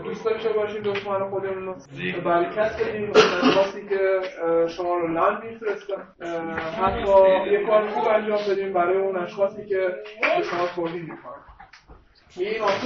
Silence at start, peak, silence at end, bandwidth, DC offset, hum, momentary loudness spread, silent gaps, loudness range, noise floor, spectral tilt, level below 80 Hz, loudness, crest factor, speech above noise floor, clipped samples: 0 s; -6 dBFS; 0 s; 7.2 kHz; under 0.1%; none; 13 LU; none; 5 LU; -51 dBFS; -3 dB/octave; -52 dBFS; -23 LUFS; 18 dB; 28 dB; under 0.1%